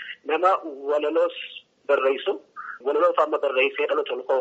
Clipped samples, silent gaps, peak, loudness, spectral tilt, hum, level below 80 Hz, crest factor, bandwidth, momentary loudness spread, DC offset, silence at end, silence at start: under 0.1%; none; -6 dBFS; -23 LUFS; 1.5 dB/octave; none; -84 dBFS; 18 dB; 8 kHz; 12 LU; under 0.1%; 0 s; 0 s